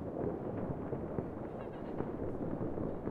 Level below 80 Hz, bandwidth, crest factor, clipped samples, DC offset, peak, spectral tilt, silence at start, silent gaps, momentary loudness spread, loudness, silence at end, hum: -52 dBFS; 5 kHz; 18 dB; under 0.1%; under 0.1%; -20 dBFS; -10.5 dB/octave; 0 s; none; 4 LU; -40 LUFS; 0 s; none